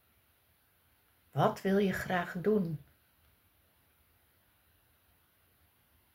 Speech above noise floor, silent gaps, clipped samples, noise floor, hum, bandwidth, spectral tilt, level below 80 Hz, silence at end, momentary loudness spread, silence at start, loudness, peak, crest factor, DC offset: 39 dB; none; under 0.1%; -70 dBFS; none; 16 kHz; -7 dB/octave; -68 dBFS; 3.4 s; 10 LU; 1.35 s; -32 LUFS; -14 dBFS; 24 dB; under 0.1%